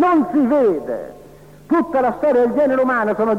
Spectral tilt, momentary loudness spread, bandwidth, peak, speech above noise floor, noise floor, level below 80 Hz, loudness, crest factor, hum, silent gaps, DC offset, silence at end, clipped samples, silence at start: -7.5 dB/octave; 10 LU; 13 kHz; -8 dBFS; 26 dB; -42 dBFS; -54 dBFS; -17 LUFS; 8 dB; 50 Hz at -50 dBFS; none; 0.2%; 0 s; under 0.1%; 0 s